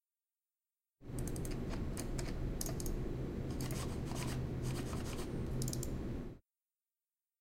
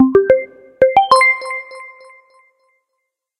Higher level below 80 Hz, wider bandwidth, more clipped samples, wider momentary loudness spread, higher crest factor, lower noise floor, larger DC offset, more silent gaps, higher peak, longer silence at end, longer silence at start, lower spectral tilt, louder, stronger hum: first, -46 dBFS vs -52 dBFS; first, 16.5 kHz vs 11.5 kHz; neither; second, 5 LU vs 23 LU; about the same, 20 dB vs 16 dB; first, under -90 dBFS vs -75 dBFS; neither; neither; second, -20 dBFS vs 0 dBFS; second, 1 s vs 1.5 s; first, 1 s vs 0 s; first, -5.5 dB/octave vs -4 dB/octave; second, -42 LUFS vs -13 LUFS; neither